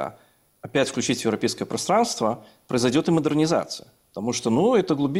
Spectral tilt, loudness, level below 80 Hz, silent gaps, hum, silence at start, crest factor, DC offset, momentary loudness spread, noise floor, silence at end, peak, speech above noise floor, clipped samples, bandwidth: -5 dB/octave; -23 LUFS; -60 dBFS; none; none; 0 s; 16 dB; under 0.1%; 14 LU; -57 dBFS; 0 s; -8 dBFS; 34 dB; under 0.1%; 16 kHz